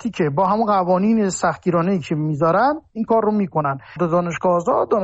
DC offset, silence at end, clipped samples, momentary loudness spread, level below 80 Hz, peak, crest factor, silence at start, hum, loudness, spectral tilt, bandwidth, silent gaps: under 0.1%; 0 s; under 0.1%; 5 LU; -54 dBFS; -8 dBFS; 12 dB; 0 s; none; -19 LUFS; -7 dB/octave; 8.2 kHz; none